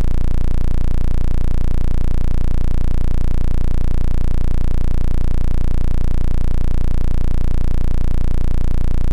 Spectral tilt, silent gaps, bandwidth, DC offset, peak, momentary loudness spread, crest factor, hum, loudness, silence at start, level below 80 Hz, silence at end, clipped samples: -8 dB/octave; none; 2.8 kHz; under 0.1%; -10 dBFS; 0 LU; 2 dB; none; -22 LUFS; 0 s; -14 dBFS; 0 s; under 0.1%